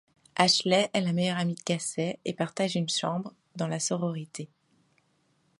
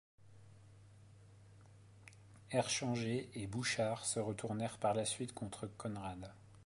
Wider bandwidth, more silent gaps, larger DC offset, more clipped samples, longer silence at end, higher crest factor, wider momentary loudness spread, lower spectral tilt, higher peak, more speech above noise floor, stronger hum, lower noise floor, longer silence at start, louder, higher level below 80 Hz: about the same, 11.5 kHz vs 11.5 kHz; neither; neither; neither; first, 1.15 s vs 0 s; about the same, 24 dB vs 20 dB; second, 14 LU vs 21 LU; about the same, -4 dB/octave vs -4 dB/octave; first, -6 dBFS vs -24 dBFS; first, 42 dB vs 22 dB; neither; first, -70 dBFS vs -61 dBFS; first, 0.35 s vs 0.2 s; first, -28 LUFS vs -40 LUFS; second, -74 dBFS vs -68 dBFS